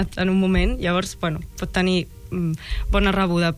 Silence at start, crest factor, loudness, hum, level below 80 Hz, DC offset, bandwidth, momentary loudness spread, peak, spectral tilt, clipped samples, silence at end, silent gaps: 0 s; 16 dB; -22 LUFS; none; -28 dBFS; under 0.1%; 14.5 kHz; 8 LU; -6 dBFS; -6 dB/octave; under 0.1%; 0 s; none